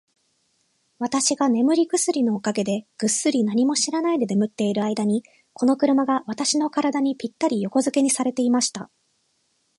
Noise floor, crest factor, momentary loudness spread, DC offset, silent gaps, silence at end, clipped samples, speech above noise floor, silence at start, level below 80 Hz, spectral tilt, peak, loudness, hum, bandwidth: -69 dBFS; 16 dB; 6 LU; under 0.1%; none; 0.95 s; under 0.1%; 47 dB; 1 s; -72 dBFS; -4 dB/octave; -8 dBFS; -22 LUFS; none; 11.5 kHz